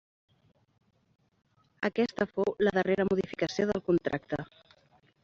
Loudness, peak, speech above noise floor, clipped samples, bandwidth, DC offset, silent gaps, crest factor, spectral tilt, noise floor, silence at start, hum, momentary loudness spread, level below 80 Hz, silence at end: -30 LUFS; -12 dBFS; 36 dB; under 0.1%; 7.6 kHz; under 0.1%; none; 20 dB; -5 dB/octave; -65 dBFS; 1.8 s; none; 8 LU; -62 dBFS; 0.8 s